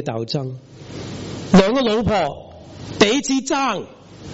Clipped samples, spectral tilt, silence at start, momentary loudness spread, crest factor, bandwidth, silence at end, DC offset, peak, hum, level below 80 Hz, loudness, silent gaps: under 0.1%; -4.5 dB/octave; 0 s; 22 LU; 18 dB; 8 kHz; 0 s; under 0.1%; -2 dBFS; none; -44 dBFS; -18 LUFS; none